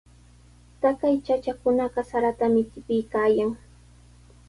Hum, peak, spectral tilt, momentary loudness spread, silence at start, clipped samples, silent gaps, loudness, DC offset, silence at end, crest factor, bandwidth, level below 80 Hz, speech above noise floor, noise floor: 60 Hz at -45 dBFS; -8 dBFS; -7 dB/octave; 5 LU; 0.8 s; under 0.1%; none; -24 LUFS; under 0.1%; 0.9 s; 16 dB; 11.5 kHz; -52 dBFS; 29 dB; -52 dBFS